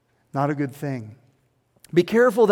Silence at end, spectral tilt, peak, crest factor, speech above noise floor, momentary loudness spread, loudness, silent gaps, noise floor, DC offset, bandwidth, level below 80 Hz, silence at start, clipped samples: 0 s; -7 dB/octave; -4 dBFS; 18 dB; 44 dB; 15 LU; -23 LUFS; none; -65 dBFS; under 0.1%; 17 kHz; -66 dBFS; 0.35 s; under 0.1%